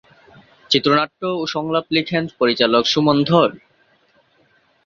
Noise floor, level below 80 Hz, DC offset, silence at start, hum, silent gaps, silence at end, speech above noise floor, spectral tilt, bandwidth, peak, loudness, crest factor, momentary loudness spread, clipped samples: -59 dBFS; -58 dBFS; under 0.1%; 0.7 s; none; none; 1.3 s; 41 dB; -5 dB/octave; 7.4 kHz; -2 dBFS; -17 LUFS; 18 dB; 8 LU; under 0.1%